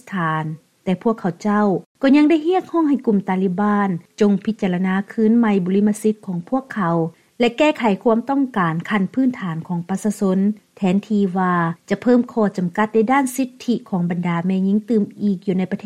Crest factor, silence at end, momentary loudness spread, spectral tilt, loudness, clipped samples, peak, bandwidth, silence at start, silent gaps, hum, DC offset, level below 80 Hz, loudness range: 14 dB; 0.1 s; 7 LU; -7 dB/octave; -19 LUFS; under 0.1%; -4 dBFS; 14 kHz; 0.05 s; 1.86-1.95 s; none; under 0.1%; -62 dBFS; 2 LU